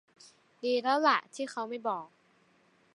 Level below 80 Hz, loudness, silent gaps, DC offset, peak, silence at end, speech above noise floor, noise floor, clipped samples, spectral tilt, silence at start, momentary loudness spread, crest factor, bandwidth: -90 dBFS; -31 LUFS; none; under 0.1%; -12 dBFS; 0.9 s; 37 dB; -67 dBFS; under 0.1%; -3 dB/octave; 0.25 s; 12 LU; 22 dB; 11.5 kHz